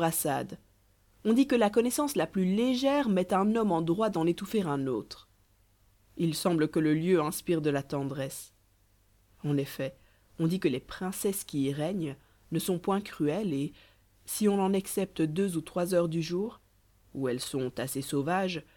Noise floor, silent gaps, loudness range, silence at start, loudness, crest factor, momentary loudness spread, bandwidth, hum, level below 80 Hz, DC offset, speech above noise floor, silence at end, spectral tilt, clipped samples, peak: -66 dBFS; none; 6 LU; 0 s; -30 LUFS; 18 dB; 11 LU; 19 kHz; none; -62 dBFS; under 0.1%; 37 dB; 0.15 s; -5.5 dB/octave; under 0.1%; -12 dBFS